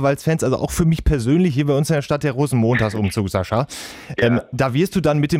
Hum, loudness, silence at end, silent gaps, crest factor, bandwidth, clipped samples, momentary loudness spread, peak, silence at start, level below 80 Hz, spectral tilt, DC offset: none; -19 LUFS; 0 s; none; 12 dB; 16 kHz; under 0.1%; 5 LU; -6 dBFS; 0 s; -34 dBFS; -6.5 dB/octave; under 0.1%